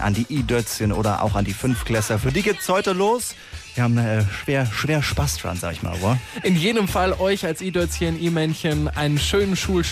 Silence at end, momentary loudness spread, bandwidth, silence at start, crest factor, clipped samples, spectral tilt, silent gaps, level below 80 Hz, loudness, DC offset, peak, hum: 0 s; 4 LU; 15.5 kHz; 0 s; 12 dB; under 0.1%; -5 dB/octave; none; -36 dBFS; -22 LUFS; under 0.1%; -8 dBFS; none